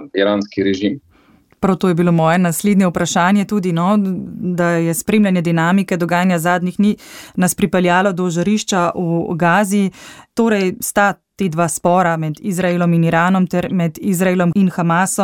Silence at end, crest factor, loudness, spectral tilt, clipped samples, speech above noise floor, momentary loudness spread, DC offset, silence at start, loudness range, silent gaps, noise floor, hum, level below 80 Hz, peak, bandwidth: 0 s; 14 dB; -16 LUFS; -5.5 dB/octave; under 0.1%; 36 dB; 6 LU; under 0.1%; 0 s; 1 LU; none; -51 dBFS; none; -50 dBFS; -2 dBFS; 17 kHz